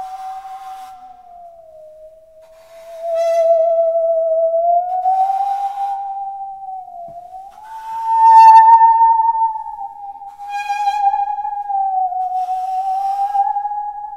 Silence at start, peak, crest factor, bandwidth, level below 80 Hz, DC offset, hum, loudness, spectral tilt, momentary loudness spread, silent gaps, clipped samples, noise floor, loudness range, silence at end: 0 s; 0 dBFS; 16 dB; 9.8 kHz; -60 dBFS; 0.1%; none; -14 LUFS; -1 dB/octave; 24 LU; none; under 0.1%; -44 dBFS; 10 LU; 0 s